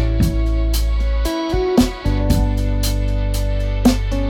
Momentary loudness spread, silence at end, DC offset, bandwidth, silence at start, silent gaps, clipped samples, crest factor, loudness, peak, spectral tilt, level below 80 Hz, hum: 4 LU; 0 s; under 0.1%; 17 kHz; 0 s; none; under 0.1%; 14 dB; -19 LUFS; -2 dBFS; -6 dB/octave; -18 dBFS; none